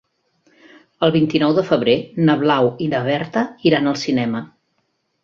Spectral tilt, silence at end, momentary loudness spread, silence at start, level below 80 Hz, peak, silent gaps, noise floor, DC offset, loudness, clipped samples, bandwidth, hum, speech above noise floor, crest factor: -6.5 dB/octave; 0.8 s; 5 LU; 1 s; -58 dBFS; -2 dBFS; none; -69 dBFS; under 0.1%; -18 LUFS; under 0.1%; 7.4 kHz; none; 52 dB; 18 dB